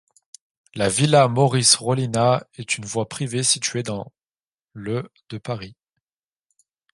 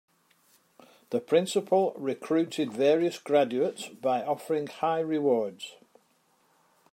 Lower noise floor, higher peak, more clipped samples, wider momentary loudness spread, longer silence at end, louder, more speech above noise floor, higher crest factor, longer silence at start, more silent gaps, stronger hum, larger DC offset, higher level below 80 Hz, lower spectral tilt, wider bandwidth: first, under -90 dBFS vs -68 dBFS; first, -2 dBFS vs -10 dBFS; neither; first, 19 LU vs 9 LU; about the same, 1.2 s vs 1.2 s; first, -20 LUFS vs -28 LUFS; first, over 69 dB vs 41 dB; about the same, 22 dB vs 18 dB; second, 0.75 s vs 1.1 s; first, 4.43-4.47 s, 4.53-4.65 s vs none; neither; neither; first, -58 dBFS vs -84 dBFS; second, -4 dB/octave vs -5.5 dB/octave; second, 11.5 kHz vs 16 kHz